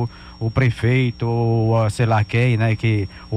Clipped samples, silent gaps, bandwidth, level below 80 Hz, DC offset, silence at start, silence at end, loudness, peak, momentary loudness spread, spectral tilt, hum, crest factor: under 0.1%; none; 9.8 kHz; -42 dBFS; under 0.1%; 0 s; 0 s; -19 LUFS; -6 dBFS; 6 LU; -7.5 dB/octave; none; 12 dB